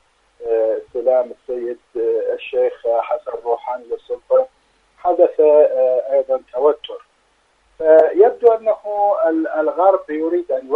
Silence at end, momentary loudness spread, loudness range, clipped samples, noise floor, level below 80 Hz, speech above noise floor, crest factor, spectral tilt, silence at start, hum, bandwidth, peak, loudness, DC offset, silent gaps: 0 s; 14 LU; 5 LU; under 0.1%; -60 dBFS; -62 dBFS; 44 dB; 18 dB; -6 dB/octave; 0.4 s; none; 4.1 kHz; 0 dBFS; -17 LUFS; under 0.1%; none